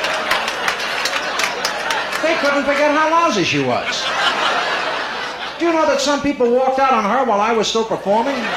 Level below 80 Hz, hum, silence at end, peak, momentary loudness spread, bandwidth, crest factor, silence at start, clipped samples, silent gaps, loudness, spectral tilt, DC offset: -52 dBFS; none; 0 s; -2 dBFS; 5 LU; 16 kHz; 16 dB; 0 s; under 0.1%; none; -17 LUFS; -3 dB/octave; under 0.1%